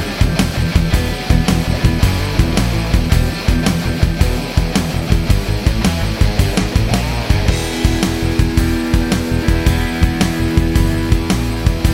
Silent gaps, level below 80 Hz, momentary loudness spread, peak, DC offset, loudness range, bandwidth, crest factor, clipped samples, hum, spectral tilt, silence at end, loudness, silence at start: none; -18 dBFS; 2 LU; 0 dBFS; under 0.1%; 1 LU; 16.5 kHz; 14 dB; under 0.1%; none; -5.5 dB/octave; 0 s; -16 LUFS; 0 s